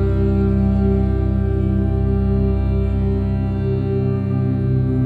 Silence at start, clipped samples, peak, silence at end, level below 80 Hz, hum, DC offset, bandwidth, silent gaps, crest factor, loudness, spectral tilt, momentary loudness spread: 0 s; under 0.1%; -6 dBFS; 0 s; -22 dBFS; none; 0.1%; 4.6 kHz; none; 10 dB; -19 LUFS; -11.5 dB/octave; 3 LU